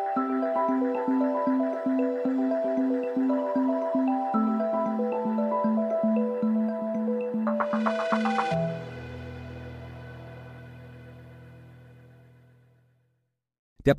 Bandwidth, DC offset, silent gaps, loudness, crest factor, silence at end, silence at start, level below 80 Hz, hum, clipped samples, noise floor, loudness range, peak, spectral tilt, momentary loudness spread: 8 kHz; under 0.1%; 13.59-13.76 s; -27 LUFS; 18 dB; 0 s; 0 s; -58 dBFS; none; under 0.1%; -76 dBFS; 17 LU; -10 dBFS; -8 dB/octave; 18 LU